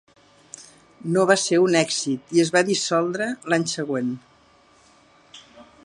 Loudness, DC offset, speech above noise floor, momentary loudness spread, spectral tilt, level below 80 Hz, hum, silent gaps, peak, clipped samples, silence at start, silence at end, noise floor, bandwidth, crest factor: -21 LUFS; under 0.1%; 35 dB; 20 LU; -4 dB/octave; -70 dBFS; none; none; -2 dBFS; under 0.1%; 0.55 s; 0.25 s; -56 dBFS; 11.5 kHz; 22 dB